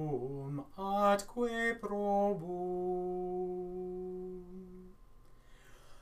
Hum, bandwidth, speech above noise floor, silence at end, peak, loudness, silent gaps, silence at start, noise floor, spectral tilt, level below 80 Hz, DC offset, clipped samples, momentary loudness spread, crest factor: none; 15.5 kHz; 24 dB; 0 s; -18 dBFS; -36 LUFS; none; 0 s; -57 dBFS; -6 dB/octave; -58 dBFS; under 0.1%; under 0.1%; 16 LU; 20 dB